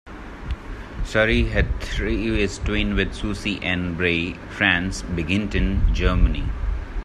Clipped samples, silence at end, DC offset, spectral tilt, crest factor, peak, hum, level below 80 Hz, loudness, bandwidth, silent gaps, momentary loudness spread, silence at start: under 0.1%; 0 s; under 0.1%; -5.5 dB/octave; 22 dB; 0 dBFS; none; -26 dBFS; -23 LUFS; 10.5 kHz; none; 14 LU; 0.05 s